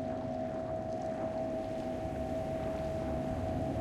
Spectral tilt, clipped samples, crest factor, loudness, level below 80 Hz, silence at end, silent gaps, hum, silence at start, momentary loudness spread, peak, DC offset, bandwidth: -8 dB/octave; under 0.1%; 12 dB; -37 LUFS; -50 dBFS; 0 s; none; none; 0 s; 2 LU; -24 dBFS; under 0.1%; 14 kHz